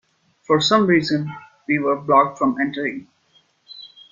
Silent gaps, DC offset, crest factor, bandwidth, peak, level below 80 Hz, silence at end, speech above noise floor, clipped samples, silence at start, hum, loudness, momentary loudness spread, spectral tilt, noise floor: none; under 0.1%; 18 dB; 7.6 kHz; -2 dBFS; -62 dBFS; 0.25 s; 41 dB; under 0.1%; 0.5 s; none; -19 LUFS; 21 LU; -5 dB/octave; -60 dBFS